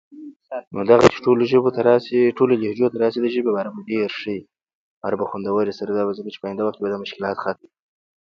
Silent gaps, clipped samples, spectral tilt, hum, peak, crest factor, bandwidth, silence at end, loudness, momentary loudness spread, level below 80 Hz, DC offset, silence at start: 0.36-0.40 s, 0.67-0.71 s, 4.75-5.01 s; under 0.1%; -6.5 dB/octave; none; 0 dBFS; 20 dB; 7.8 kHz; 0.75 s; -20 LUFS; 14 LU; -58 dBFS; under 0.1%; 0.1 s